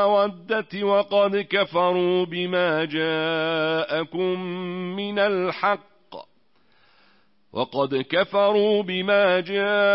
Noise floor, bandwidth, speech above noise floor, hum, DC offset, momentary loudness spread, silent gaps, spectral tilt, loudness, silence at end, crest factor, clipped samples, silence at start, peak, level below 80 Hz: -65 dBFS; 5.8 kHz; 43 dB; none; 0.1%; 10 LU; none; -9.5 dB/octave; -23 LUFS; 0 s; 16 dB; under 0.1%; 0 s; -8 dBFS; -72 dBFS